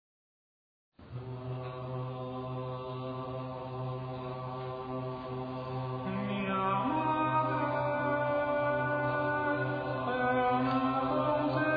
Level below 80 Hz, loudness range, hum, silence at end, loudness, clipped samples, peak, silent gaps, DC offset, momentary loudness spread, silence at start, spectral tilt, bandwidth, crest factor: -60 dBFS; 9 LU; none; 0 s; -33 LUFS; under 0.1%; -18 dBFS; none; under 0.1%; 10 LU; 1 s; -9.5 dB/octave; 5 kHz; 16 dB